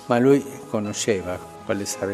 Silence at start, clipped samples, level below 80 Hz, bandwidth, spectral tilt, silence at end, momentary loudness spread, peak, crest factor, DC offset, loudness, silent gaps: 0 s; under 0.1%; -62 dBFS; 14.5 kHz; -5 dB/octave; 0 s; 12 LU; -4 dBFS; 20 dB; under 0.1%; -23 LUFS; none